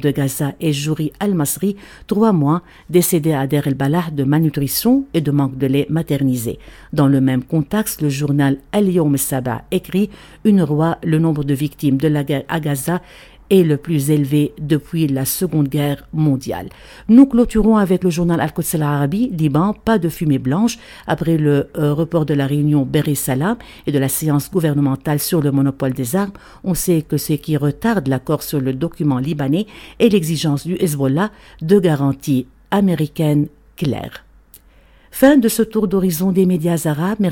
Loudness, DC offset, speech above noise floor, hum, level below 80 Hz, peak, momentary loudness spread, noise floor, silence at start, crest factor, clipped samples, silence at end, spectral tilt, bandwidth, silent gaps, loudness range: -17 LUFS; under 0.1%; 32 dB; none; -42 dBFS; 0 dBFS; 7 LU; -48 dBFS; 0 s; 16 dB; under 0.1%; 0 s; -6.5 dB/octave; 17.5 kHz; none; 3 LU